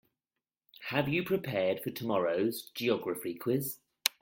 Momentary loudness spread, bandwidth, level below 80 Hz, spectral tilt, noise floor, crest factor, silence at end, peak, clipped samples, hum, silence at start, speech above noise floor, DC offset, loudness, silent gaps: 5 LU; 17 kHz; -72 dBFS; -4.5 dB/octave; under -90 dBFS; 28 dB; 0.15 s; -6 dBFS; under 0.1%; none; 0.8 s; over 58 dB; under 0.1%; -33 LUFS; none